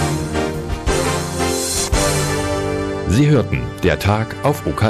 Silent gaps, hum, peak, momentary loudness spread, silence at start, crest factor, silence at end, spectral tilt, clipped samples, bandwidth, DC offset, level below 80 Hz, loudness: none; none; -4 dBFS; 6 LU; 0 s; 12 dB; 0 s; -5 dB/octave; under 0.1%; 15.5 kHz; under 0.1%; -28 dBFS; -18 LUFS